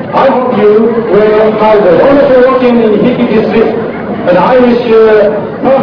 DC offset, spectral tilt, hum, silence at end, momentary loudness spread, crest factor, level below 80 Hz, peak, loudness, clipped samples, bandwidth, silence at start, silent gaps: under 0.1%; -8.5 dB/octave; none; 0 s; 5 LU; 6 dB; -38 dBFS; 0 dBFS; -7 LUFS; 4%; 5.4 kHz; 0 s; none